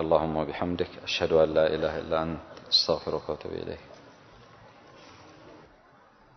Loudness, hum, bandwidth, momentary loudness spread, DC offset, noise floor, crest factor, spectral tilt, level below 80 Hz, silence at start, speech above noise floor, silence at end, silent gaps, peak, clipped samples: -27 LUFS; none; 6.4 kHz; 14 LU; under 0.1%; -57 dBFS; 22 dB; -5 dB/octave; -52 dBFS; 0 s; 30 dB; 0.75 s; none; -8 dBFS; under 0.1%